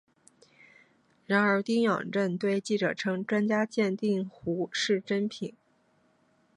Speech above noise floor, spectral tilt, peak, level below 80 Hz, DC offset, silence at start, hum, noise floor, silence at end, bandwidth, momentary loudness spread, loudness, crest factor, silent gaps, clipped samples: 40 dB; -5.5 dB/octave; -10 dBFS; -74 dBFS; under 0.1%; 1.3 s; none; -68 dBFS; 1.05 s; 11 kHz; 7 LU; -29 LUFS; 20 dB; none; under 0.1%